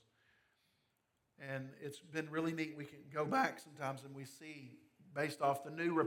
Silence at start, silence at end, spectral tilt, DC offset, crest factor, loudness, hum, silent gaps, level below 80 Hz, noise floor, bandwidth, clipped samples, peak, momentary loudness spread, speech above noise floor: 1.4 s; 0 s; -5.5 dB/octave; under 0.1%; 22 dB; -41 LUFS; none; none; -90 dBFS; -82 dBFS; 17.5 kHz; under 0.1%; -20 dBFS; 16 LU; 42 dB